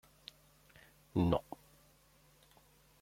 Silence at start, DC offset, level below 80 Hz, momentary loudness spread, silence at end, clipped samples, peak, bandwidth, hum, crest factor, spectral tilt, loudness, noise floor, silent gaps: 1.15 s; under 0.1%; -60 dBFS; 28 LU; 1.6 s; under 0.1%; -16 dBFS; 16.5 kHz; none; 26 dB; -8 dB/octave; -36 LUFS; -67 dBFS; none